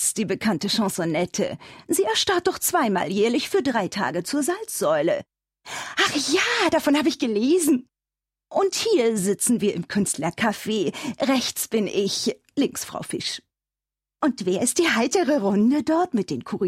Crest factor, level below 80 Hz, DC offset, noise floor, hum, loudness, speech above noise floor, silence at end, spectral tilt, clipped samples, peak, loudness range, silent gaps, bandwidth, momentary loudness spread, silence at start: 16 dB; -62 dBFS; under 0.1%; -90 dBFS; none; -23 LUFS; 67 dB; 0 s; -3.5 dB/octave; under 0.1%; -8 dBFS; 3 LU; none; 16 kHz; 8 LU; 0 s